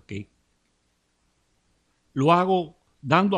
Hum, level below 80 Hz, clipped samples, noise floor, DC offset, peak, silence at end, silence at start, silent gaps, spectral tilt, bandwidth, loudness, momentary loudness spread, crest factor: 60 Hz at -55 dBFS; -66 dBFS; under 0.1%; -70 dBFS; under 0.1%; -4 dBFS; 0 s; 0.1 s; none; -7 dB/octave; 9.6 kHz; -22 LUFS; 18 LU; 22 dB